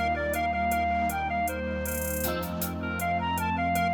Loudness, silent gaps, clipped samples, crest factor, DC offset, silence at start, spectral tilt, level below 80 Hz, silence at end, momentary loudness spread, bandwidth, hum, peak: -28 LUFS; none; under 0.1%; 14 dB; under 0.1%; 0 s; -5 dB/octave; -42 dBFS; 0 s; 4 LU; over 20 kHz; none; -14 dBFS